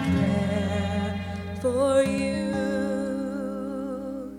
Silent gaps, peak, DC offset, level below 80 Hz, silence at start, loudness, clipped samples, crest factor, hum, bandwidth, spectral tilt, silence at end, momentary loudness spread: none; -10 dBFS; under 0.1%; -48 dBFS; 0 s; -27 LUFS; under 0.1%; 16 dB; 60 Hz at -45 dBFS; 14 kHz; -6.5 dB/octave; 0 s; 10 LU